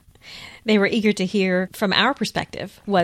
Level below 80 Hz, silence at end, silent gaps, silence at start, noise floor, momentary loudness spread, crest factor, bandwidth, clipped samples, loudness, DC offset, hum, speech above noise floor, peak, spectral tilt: -56 dBFS; 0 s; none; 0.25 s; -42 dBFS; 17 LU; 20 dB; 15 kHz; under 0.1%; -20 LUFS; under 0.1%; none; 21 dB; -2 dBFS; -5 dB/octave